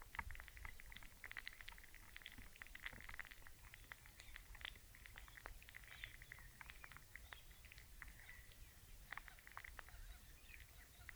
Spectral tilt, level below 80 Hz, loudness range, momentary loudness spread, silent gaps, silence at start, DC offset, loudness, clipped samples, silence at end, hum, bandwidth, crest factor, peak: -2 dB/octave; -62 dBFS; 3 LU; 7 LU; none; 0 s; under 0.1%; -57 LUFS; under 0.1%; 0 s; none; over 20 kHz; 26 dB; -30 dBFS